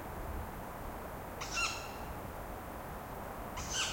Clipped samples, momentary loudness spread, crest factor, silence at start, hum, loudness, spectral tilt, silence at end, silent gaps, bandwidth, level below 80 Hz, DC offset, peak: under 0.1%; 10 LU; 20 dB; 0 s; none; -41 LUFS; -2.5 dB/octave; 0 s; none; 16.5 kHz; -50 dBFS; under 0.1%; -22 dBFS